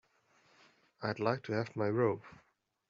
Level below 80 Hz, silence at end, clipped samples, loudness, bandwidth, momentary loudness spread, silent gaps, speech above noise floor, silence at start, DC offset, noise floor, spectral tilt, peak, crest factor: -76 dBFS; 0.6 s; under 0.1%; -35 LUFS; 7.6 kHz; 9 LU; none; 36 dB; 1 s; under 0.1%; -70 dBFS; -6 dB/octave; -16 dBFS; 22 dB